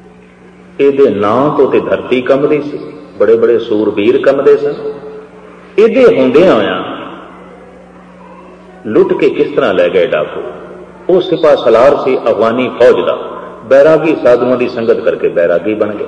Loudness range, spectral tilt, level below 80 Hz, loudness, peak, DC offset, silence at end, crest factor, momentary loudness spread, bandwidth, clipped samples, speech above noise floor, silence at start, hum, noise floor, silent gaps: 4 LU; -7 dB/octave; -48 dBFS; -10 LUFS; 0 dBFS; under 0.1%; 0 s; 10 dB; 17 LU; 8.4 kHz; 0.4%; 28 dB; 0.8 s; none; -38 dBFS; none